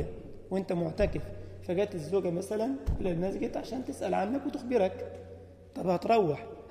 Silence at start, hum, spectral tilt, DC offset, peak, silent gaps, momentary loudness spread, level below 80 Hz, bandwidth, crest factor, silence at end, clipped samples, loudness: 0 s; none; -7 dB/octave; under 0.1%; -14 dBFS; none; 16 LU; -46 dBFS; 15.5 kHz; 18 dB; 0 s; under 0.1%; -32 LUFS